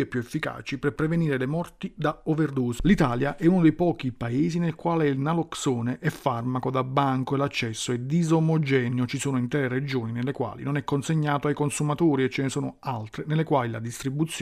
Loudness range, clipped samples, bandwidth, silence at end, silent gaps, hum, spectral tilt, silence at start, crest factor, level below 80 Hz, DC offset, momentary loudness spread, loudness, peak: 2 LU; under 0.1%; 14.5 kHz; 0 s; none; none; -6.5 dB/octave; 0 s; 18 dB; -48 dBFS; under 0.1%; 8 LU; -26 LUFS; -8 dBFS